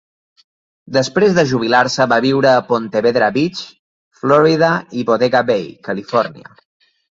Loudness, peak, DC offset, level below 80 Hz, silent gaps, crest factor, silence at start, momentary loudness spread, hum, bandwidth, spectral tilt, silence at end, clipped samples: -15 LUFS; 0 dBFS; under 0.1%; -56 dBFS; 3.79-4.11 s; 16 dB; 0.9 s; 10 LU; none; 7.8 kHz; -5.5 dB/octave; 0.7 s; under 0.1%